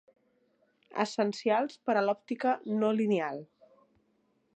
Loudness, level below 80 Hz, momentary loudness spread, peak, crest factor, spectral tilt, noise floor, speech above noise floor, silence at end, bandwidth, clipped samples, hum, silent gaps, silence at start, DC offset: -30 LUFS; -84 dBFS; 7 LU; -14 dBFS; 18 dB; -6 dB/octave; -73 dBFS; 43 dB; 1.1 s; 8.8 kHz; under 0.1%; none; none; 0.95 s; under 0.1%